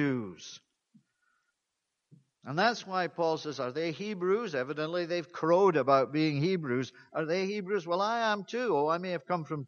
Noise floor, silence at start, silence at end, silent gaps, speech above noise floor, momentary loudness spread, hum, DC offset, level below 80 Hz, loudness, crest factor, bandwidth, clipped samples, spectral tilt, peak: -85 dBFS; 0 s; 0 s; none; 54 dB; 10 LU; none; under 0.1%; -78 dBFS; -30 LUFS; 20 dB; 7.2 kHz; under 0.1%; -6 dB/octave; -12 dBFS